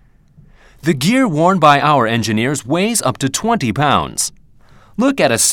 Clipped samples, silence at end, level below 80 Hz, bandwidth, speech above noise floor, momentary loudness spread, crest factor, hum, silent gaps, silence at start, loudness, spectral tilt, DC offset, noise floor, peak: under 0.1%; 0 s; -48 dBFS; 18 kHz; 32 dB; 9 LU; 16 dB; none; none; 0.85 s; -15 LUFS; -4 dB/octave; under 0.1%; -46 dBFS; 0 dBFS